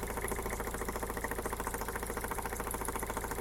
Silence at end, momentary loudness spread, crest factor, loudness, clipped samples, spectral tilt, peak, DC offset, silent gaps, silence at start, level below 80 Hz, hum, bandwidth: 0 s; 1 LU; 16 dB; -38 LUFS; under 0.1%; -4 dB/octave; -22 dBFS; under 0.1%; none; 0 s; -44 dBFS; none; 17 kHz